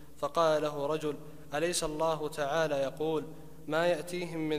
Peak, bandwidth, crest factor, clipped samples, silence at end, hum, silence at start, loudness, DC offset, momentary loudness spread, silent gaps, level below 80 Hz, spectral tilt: -14 dBFS; 15.5 kHz; 18 dB; under 0.1%; 0 s; none; 0 s; -32 LUFS; 0.4%; 10 LU; none; -58 dBFS; -4 dB/octave